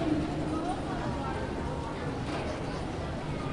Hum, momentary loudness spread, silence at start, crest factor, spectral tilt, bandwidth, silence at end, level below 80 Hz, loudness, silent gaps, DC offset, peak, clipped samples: none; 4 LU; 0 s; 14 dB; -6.5 dB/octave; 11.5 kHz; 0 s; -44 dBFS; -34 LUFS; none; under 0.1%; -18 dBFS; under 0.1%